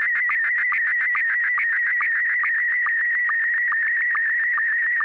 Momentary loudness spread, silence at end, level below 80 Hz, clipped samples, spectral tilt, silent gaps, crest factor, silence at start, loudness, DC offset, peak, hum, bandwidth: 0 LU; 0 s; -76 dBFS; under 0.1%; -1 dB/octave; none; 4 dB; 0 s; -19 LUFS; under 0.1%; -18 dBFS; none; 4.7 kHz